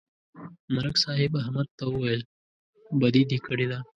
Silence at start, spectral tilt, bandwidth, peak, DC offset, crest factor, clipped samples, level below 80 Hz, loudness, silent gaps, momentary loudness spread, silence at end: 0.35 s; -6 dB/octave; 10.5 kHz; -6 dBFS; under 0.1%; 20 dB; under 0.1%; -58 dBFS; -26 LUFS; 0.59-0.68 s, 1.71-1.78 s, 2.25-2.73 s; 22 LU; 0.15 s